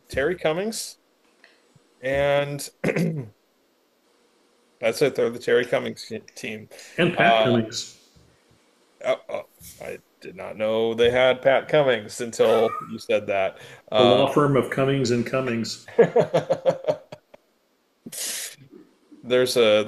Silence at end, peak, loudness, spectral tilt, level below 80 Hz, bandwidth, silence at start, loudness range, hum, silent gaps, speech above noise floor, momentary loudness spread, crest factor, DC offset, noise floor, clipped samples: 0 s; -4 dBFS; -22 LUFS; -4.5 dB/octave; -58 dBFS; 14 kHz; 0.1 s; 7 LU; none; none; 44 dB; 17 LU; 20 dB; under 0.1%; -67 dBFS; under 0.1%